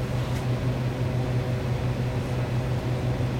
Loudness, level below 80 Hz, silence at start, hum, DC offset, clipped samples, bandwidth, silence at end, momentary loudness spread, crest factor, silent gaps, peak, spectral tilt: -27 LUFS; -38 dBFS; 0 s; none; under 0.1%; under 0.1%; 15.5 kHz; 0 s; 1 LU; 12 dB; none; -14 dBFS; -7.5 dB/octave